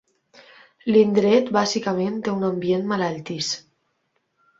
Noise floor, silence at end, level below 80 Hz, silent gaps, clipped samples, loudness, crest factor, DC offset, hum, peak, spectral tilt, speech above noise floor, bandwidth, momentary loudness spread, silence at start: -71 dBFS; 1 s; -64 dBFS; none; under 0.1%; -22 LUFS; 18 dB; under 0.1%; none; -4 dBFS; -5 dB/octave; 51 dB; 7.8 kHz; 10 LU; 0.85 s